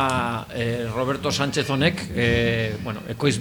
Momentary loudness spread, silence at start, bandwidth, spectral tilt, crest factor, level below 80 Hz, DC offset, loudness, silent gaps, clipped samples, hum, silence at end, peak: 6 LU; 0 s; over 20 kHz; -5 dB/octave; 18 dB; -44 dBFS; under 0.1%; -23 LUFS; none; under 0.1%; none; 0 s; -6 dBFS